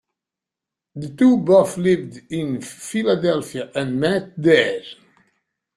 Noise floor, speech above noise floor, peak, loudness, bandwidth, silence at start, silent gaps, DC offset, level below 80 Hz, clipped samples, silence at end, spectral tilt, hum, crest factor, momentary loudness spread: -87 dBFS; 68 dB; -2 dBFS; -19 LUFS; 13 kHz; 0.95 s; none; under 0.1%; -60 dBFS; under 0.1%; 0.85 s; -6 dB/octave; none; 18 dB; 15 LU